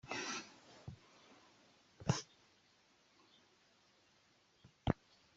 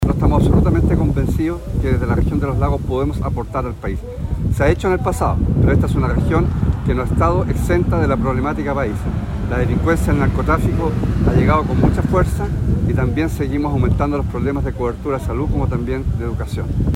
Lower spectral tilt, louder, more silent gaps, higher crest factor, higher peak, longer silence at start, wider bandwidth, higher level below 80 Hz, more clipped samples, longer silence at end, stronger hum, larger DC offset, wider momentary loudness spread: second, -4.5 dB/octave vs -8.5 dB/octave; second, -43 LUFS vs -18 LUFS; neither; first, 32 dB vs 14 dB; second, -16 dBFS vs -4 dBFS; about the same, 0.05 s vs 0 s; second, 8 kHz vs 15.5 kHz; second, -64 dBFS vs -22 dBFS; neither; first, 0.45 s vs 0 s; neither; neither; first, 23 LU vs 7 LU